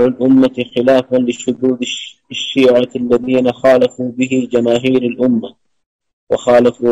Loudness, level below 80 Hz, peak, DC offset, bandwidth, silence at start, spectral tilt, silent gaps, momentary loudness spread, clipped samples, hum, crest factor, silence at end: -14 LUFS; -52 dBFS; -2 dBFS; under 0.1%; 8.2 kHz; 0 s; -5.5 dB/octave; 5.86-5.99 s, 6.13-6.27 s; 8 LU; under 0.1%; none; 10 dB; 0 s